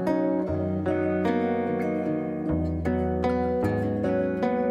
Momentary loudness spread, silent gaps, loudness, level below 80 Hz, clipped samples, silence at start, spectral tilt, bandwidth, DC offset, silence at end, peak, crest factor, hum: 3 LU; none; -26 LUFS; -44 dBFS; under 0.1%; 0 s; -9 dB/octave; 11.5 kHz; under 0.1%; 0 s; -12 dBFS; 14 dB; none